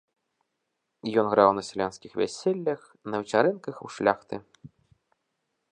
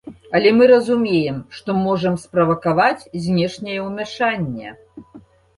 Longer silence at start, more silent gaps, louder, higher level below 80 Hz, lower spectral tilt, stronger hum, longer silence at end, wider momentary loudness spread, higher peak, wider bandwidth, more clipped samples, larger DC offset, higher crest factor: first, 1.05 s vs 0.05 s; neither; second, -26 LUFS vs -18 LUFS; second, -68 dBFS vs -54 dBFS; about the same, -5.5 dB/octave vs -6.5 dB/octave; neither; first, 1.3 s vs 0.4 s; first, 16 LU vs 13 LU; about the same, -4 dBFS vs -2 dBFS; second, 10 kHz vs 11.5 kHz; neither; neither; first, 24 dB vs 16 dB